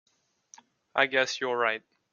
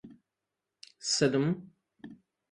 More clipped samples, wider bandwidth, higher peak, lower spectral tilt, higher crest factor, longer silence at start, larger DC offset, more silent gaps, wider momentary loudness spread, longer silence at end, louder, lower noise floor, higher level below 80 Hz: neither; second, 7.4 kHz vs 11.5 kHz; first, -6 dBFS vs -12 dBFS; second, -2 dB/octave vs -4 dB/octave; about the same, 24 dB vs 22 dB; first, 0.95 s vs 0.05 s; neither; neither; second, 8 LU vs 25 LU; about the same, 0.35 s vs 0.4 s; first, -27 LUFS vs -30 LUFS; second, -60 dBFS vs -87 dBFS; second, -80 dBFS vs -72 dBFS